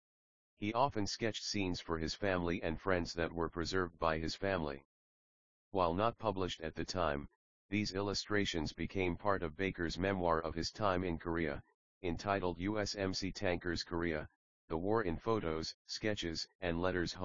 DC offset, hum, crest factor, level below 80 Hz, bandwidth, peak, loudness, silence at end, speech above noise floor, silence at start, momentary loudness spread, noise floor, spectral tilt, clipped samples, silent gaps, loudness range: 0.2%; none; 22 dB; -56 dBFS; 7.4 kHz; -16 dBFS; -38 LUFS; 0 s; over 53 dB; 0.55 s; 6 LU; under -90 dBFS; -4 dB/octave; under 0.1%; 4.85-5.72 s, 7.36-7.69 s, 11.74-12.01 s, 14.36-14.68 s, 15.74-15.85 s, 16.55-16.59 s; 2 LU